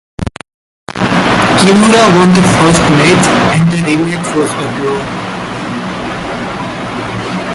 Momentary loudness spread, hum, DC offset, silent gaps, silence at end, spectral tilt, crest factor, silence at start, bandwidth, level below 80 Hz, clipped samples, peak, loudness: 13 LU; none; under 0.1%; 0.54-0.87 s; 0 s; -5 dB/octave; 10 dB; 0.2 s; 11.5 kHz; -34 dBFS; under 0.1%; 0 dBFS; -10 LUFS